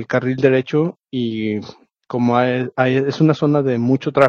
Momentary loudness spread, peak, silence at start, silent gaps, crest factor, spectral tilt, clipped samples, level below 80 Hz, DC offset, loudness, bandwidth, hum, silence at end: 8 LU; 0 dBFS; 0 s; none; 18 dB; -8 dB/octave; under 0.1%; -60 dBFS; under 0.1%; -18 LUFS; 7.4 kHz; none; 0 s